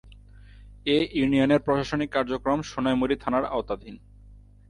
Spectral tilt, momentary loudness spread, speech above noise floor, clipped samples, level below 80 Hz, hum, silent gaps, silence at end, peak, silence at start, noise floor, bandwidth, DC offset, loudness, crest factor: -6 dB/octave; 11 LU; 25 dB; under 0.1%; -48 dBFS; 50 Hz at -50 dBFS; none; 0.3 s; -10 dBFS; 0.05 s; -50 dBFS; 10.5 kHz; under 0.1%; -25 LUFS; 16 dB